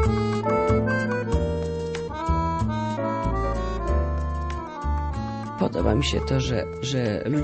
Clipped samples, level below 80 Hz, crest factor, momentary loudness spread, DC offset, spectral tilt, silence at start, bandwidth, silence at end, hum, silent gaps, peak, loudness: under 0.1%; -30 dBFS; 16 dB; 7 LU; under 0.1%; -6.5 dB/octave; 0 s; 8.4 kHz; 0 s; none; none; -8 dBFS; -25 LUFS